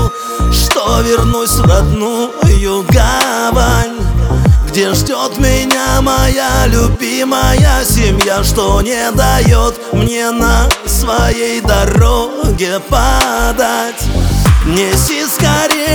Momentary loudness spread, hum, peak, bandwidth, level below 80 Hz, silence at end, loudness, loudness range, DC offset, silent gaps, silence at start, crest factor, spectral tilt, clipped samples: 5 LU; none; 0 dBFS; over 20 kHz; -16 dBFS; 0 s; -11 LUFS; 1 LU; under 0.1%; none; 0 s; 10 dB; -4.5 dB/octave; under 0.1%